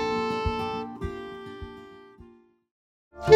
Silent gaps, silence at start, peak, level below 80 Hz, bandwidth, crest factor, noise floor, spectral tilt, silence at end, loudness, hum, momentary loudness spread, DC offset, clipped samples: 2.71-3.11 s; 0 s; -2 dBFS; -44 dBFS; 13.5 kHz; 24 dB; -55 dBFS; -6 dB/octave; 0 s; -32 LUFS; none; 24 LU; under 0.1%; under 0.1%